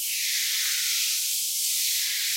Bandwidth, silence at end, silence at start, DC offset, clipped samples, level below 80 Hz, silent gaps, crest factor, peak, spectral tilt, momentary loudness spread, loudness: 16.5 kHz; 0 s; 0 s; under 0.1%; under 0.1%; -88 dBFS; none; 14 dB; -12 dBFS; 6.5 dB/octave; 1 LU; -23 LUFS